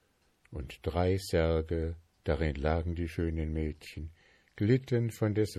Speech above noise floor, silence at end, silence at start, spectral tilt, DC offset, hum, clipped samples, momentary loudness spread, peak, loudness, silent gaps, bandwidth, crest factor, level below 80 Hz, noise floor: 38 dB; 0 s; 0.5 s; -7.5 dB/octave; under 0.1%; none; under 0.1%; 15 LU; -14 dBFS; -32 LUFS; none; 14.5 kHz; 18 dB; -40 dBFS; -69 dBFS